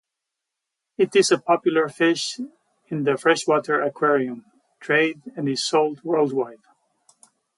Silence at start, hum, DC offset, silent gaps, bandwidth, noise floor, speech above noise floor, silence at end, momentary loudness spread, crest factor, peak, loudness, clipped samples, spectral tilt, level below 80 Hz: 1 s; none; under 0.1%; none; 11.5 kHz; -83 dBFS; 62 dB; 1.05 s; 13 LU; 18 dB; -4 dBFS; -21 LUFS; under 0.1%; -4 dB/octave; -74 dBFS